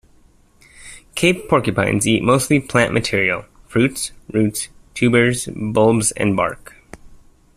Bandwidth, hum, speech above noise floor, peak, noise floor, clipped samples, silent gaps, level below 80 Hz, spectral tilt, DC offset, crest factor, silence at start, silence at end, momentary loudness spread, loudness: 15 kHz; none; 35 dB; -2 dBFS; -52 dBFS; under 0.1%; none; -46 dBFS; -4.5 dB/octave; under 0.1%; 18 dB; 0.8 s; 0.4 s; 11 LU; -18 LUFS